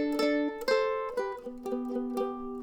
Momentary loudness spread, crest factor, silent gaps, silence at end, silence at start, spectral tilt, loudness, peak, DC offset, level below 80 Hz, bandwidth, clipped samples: 8 LU; 16 dB; none; 0 s; 0 s; -4 dB/octave; -31 LUFS; -14 dBFS; under 0.1%; -58 dBFS; 18.5 kHz; under 0.1%